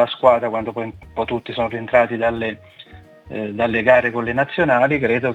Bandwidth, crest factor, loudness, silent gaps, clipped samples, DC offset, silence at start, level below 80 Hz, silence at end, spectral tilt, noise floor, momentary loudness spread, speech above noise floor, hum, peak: 7.8 kHz; 18 dB; -19 LUFS; none; under 0.1%; under 0.1%; 0 s; -50 dBFS; 0 s; -7.5 dB/octave; -42 dBFS; 13 LU; 24 dB; none; 0 dBFS